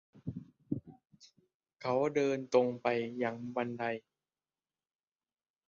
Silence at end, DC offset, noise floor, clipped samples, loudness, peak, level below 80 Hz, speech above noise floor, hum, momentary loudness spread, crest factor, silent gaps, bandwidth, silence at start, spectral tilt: 1.7 s; under 0.1%; under -90 dBFS; under 0.1%; -34 LUFS; -14 dBFS; -72 dBFS; over 57 dB; none; 15 LU; 24 dB; 1.54-1.60 s; 7.4 kHz; 0.15 s; -5 dB/octave